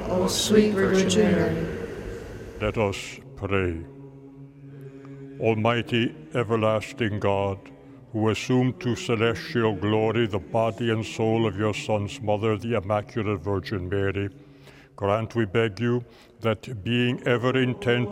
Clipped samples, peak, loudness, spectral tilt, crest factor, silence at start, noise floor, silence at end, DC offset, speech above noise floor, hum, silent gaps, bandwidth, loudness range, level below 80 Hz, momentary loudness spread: under 0.1%; -6 dBFS; -25 LUFS; -5.5 dB/octave; 20 dB; 0 s; -49 dBFS; 0 s; under 0.1%; 25 dB; none; none; 16 kHz; 4 LU; -50 dBFS; 15 LU